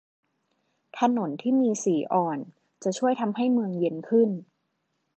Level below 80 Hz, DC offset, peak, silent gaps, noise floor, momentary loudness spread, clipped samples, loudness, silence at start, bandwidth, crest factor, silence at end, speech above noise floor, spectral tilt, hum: -82 dBFS; under 0.1%; -10 dBFS; none; -76 dBFS; 10 LU; under 0.1%; -26 LUFS; 0.95 s; 8.8 kHz; 18 dB; 0.75 s; 52 dB; -6 dB/octave; none